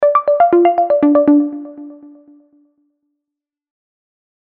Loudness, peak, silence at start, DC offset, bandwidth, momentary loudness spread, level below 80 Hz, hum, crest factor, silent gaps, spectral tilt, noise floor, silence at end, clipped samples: -12 LUFS; 0 dBFS; 0 s; under 0.1%; 4 kHz; 20 LU; -60 dBFS; none; 16 dB; none; -9.5 dB/octave; -83 dBFS; 2.5 s; under 0.1%